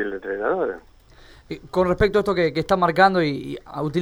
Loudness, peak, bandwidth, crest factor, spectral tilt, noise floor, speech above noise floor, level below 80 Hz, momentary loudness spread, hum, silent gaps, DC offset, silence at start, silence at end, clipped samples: -21 LUFS; -2 dBFS; 19.5 kHz; 20 dB; -6.5 dB/octave; -48 dBFS; 27 dB; -42 dBFS; 15 LU; none; none; under 0.1%; 0 s; 0 s; under 0.1%